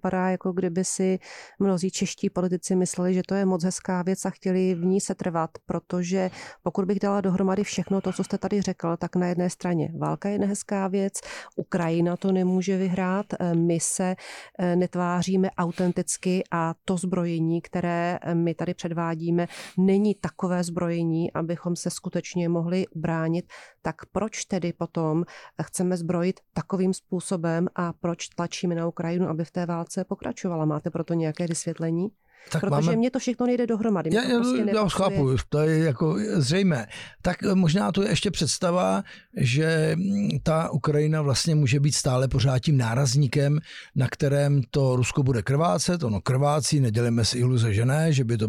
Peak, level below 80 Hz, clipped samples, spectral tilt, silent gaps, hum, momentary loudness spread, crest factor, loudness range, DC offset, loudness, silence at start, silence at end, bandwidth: -12 dBFS; -52 dBFS; under 0.1%; -6 dB/octave; none; none; 7 LU; 12 dB; 5 LU; under 0.1%; -25 LUFS; 0.05 s; 0 s; 13.5 kHz